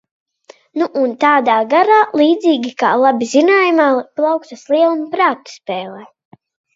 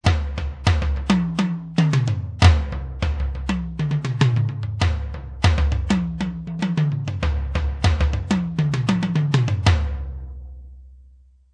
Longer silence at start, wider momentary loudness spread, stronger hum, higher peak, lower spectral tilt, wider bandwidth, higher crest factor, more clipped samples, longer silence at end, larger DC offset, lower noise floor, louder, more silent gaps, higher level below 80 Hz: first, 0.75 s vs 0.05 s; first, 13 LU vs 9 LU; neither; about the same, 0 dBFS vs -2 dBFS; second, -4 dB/octave vs -6.5 dB/octave; second, 7.8 kHz vs 10 kHz; second, 14 dB vs 20 dB; neither; first, 0.7 s vs 0.5 s; neither; second, -46 dBFS vs -50 dBFS; first, -14 LUFS vs -22 LUFS; neither; second, -72 dBFS vs -28 dBFS